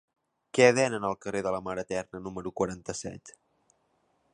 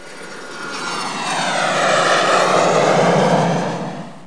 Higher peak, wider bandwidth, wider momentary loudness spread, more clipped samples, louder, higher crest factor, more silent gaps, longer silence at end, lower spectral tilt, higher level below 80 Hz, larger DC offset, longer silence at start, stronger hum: second, -6 dBFS vs -2 dBFS; about the same, 11 kHz vs 10.5 kHz; about the same, 16 LU vs 15 LU; neither; second, -29 LUFS vs -16 LUFS; first, 24 dB vs 16 dB; neither; first, 1.05 s vs 0 s; about the same, -4.5 dB/octave vs -4 dB/octave; first, -62 dBFS vs -70 dBFS; second, under 0.1% vs 1%; first, 0.55 s vs 0 s; neither